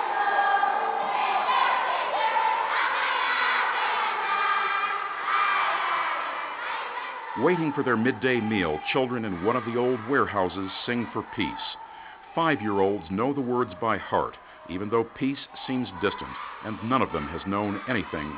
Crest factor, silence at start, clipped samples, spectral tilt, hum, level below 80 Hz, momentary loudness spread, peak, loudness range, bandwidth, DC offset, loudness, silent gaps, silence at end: 18 dB; 0 s; under 0.1%; -3 dB/octave; none; -56 dBFS; 10 LU; -8 dBFS; 5 LU; 4 kHz; under 0.1%; -26 LUFS; none; 0 s